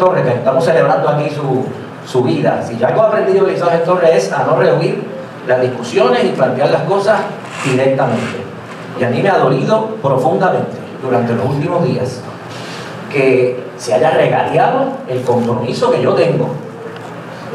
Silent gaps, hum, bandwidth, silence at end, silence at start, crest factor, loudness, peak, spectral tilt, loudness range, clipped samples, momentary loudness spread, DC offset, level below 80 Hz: none; none; 13 kHz; 0 s; 0 s; 14 dB; -14 LUFS; 0 dBFS; -6.5 dB/octave; 3 LU; under 0.1%; 14 LU; under 0.1%; -64 dBFS